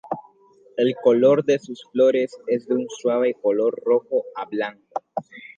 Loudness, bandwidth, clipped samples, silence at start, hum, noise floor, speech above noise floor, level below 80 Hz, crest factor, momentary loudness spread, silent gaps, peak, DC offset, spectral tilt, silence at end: -21 LUFS; 7.6 kHz; under 0.1%; 0.05 s; none; -54 dBFS; 33 dB; -76 dBFS; 18 dB; 16 LU; none; -4 dBFS; under 0.1%; -6 dB/octave; 0.1 s